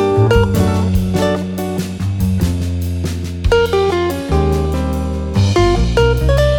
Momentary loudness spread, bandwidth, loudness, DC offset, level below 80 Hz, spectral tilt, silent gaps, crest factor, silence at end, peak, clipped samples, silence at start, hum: 8 LU; 18.5 kHz; -16 LUFS; under 0.1%; -22 dBFS; -6.5 dB/octave; none; 14 dB; 0 s; 0 dBFS; under 0.1%; 0 s; none